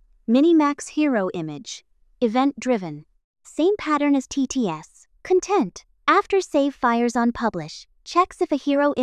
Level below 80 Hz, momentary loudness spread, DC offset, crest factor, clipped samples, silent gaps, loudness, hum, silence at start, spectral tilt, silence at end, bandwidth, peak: -56 dBFS; 16 LU; under 0.1%; 18 dB; under 0.1%; 3.24-3.34 s; -22 LUFS; none; 0.3 s; -5 dB/octave; 0 s; 11 kHz; -4 dBFS